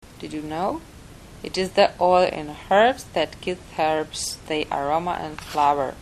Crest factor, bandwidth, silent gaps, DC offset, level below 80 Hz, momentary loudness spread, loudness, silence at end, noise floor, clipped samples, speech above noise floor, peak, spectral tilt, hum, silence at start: 20 dB; 14 kHz; none; under 0.1%; -48 dBFS; 12 LU; -23 LUFS; 0 s; -43 dBFS; under 0.1%; 20 dB; -4 dBFS; -4 dB/octave; none; 0.1 s